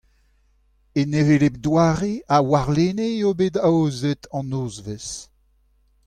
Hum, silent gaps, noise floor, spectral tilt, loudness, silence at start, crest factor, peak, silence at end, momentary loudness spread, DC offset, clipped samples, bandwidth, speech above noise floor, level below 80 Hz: none; none; -61 dBFS; -6.5 dB/octave; -21 LUFS; 0.95 s; 16 dB; -6 dBFS; 0.85 s; 13 LU; under 0.1%; under 0.1%; 10 kHz; 41 dB; -48 dBFS